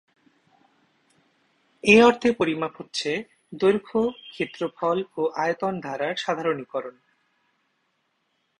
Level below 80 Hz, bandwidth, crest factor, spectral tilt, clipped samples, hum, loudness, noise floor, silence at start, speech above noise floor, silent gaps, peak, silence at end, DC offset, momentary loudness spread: -62 dBFS; 11 kHz; 22 dB; -5 dB/octave; under 0.1%; none; -24 LUFS; -73 dBFS; 1.85 s; 49 dB; none; -4 dBFS; 1.7 s; under 0.1%; 15 LU